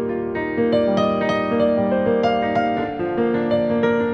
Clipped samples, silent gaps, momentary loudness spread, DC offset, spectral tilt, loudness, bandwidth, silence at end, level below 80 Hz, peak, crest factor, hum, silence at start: under 0.1%; none; 5 LU; under 0.1%; -7.5 dB/octave; -20 LUFS; 6.6 kHz; 0 s; -52 dBFS; -6 dBFS; 12 dB; none; 0 s